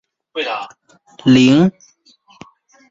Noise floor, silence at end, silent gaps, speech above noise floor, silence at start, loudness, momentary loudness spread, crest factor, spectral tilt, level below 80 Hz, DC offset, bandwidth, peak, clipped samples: -52 dBFS; 1.2 s; none; 37 dB; 0.35 s; -14 LUFS; 18 LU; 16 dB; -6 dB/octave; -54 dBFS; under 0.1%; 7.8 kHz; 0 dBFS; under 0.1%